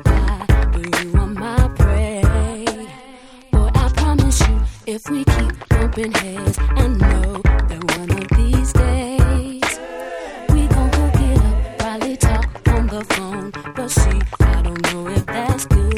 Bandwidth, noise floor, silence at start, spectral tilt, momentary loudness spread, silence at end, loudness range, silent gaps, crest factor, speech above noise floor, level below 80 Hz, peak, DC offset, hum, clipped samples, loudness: 14 kHz; -41 dBFS; 0 s; -5.5 dB/octave; 8 LU; 0 s; 1 LU; none; 16 dB; 25 dB; -18 dBFS; 0 dBFS; under 0.1%; none; under 0.1%; -18 LUFS